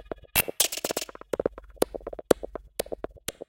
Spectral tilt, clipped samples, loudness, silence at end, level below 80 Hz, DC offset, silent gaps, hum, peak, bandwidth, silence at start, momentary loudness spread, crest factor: -2 dB/octave; under 0.1%; -29 LUFS; 0.2 s; -50 dBFS; under 0.1%; none; none; 0 dBFS; 17 kHz; 0.05 s; 12 LU; 30 dB